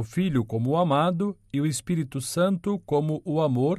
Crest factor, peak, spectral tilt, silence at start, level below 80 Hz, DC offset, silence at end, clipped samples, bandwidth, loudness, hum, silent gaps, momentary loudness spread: 14 dB; -12 dBFS; -6.5 dB/octave; 0 s; -56 dBFS; under 0.1%; 0 s; under 0.1%; 13.5 kHz; -26 LUFS; none; none; 6 LU